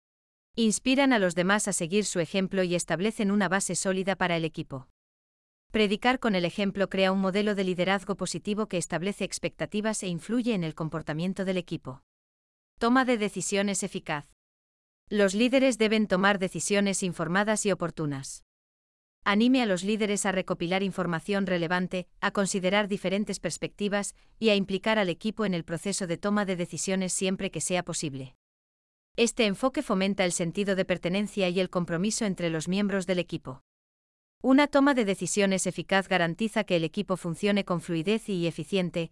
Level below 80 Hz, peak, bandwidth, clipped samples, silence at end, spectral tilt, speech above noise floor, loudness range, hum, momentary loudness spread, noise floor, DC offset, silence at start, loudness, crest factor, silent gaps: -58 dBFS; -10 dBFS; 12 kHz; under 0.1%; 0.05 s; -4.5 dB/octave; over 63 dB; 4 LU; none; 9 LU; under -90 dBFS; under 0.1%; 0.55 s; -27 LUFS; 18 dB; 4.90-5.70 s, 12.03-12.77 s, 14.33-15.07 s, 18.42-19.22 s, 28.35-29.15 s, 33.61-34.41 s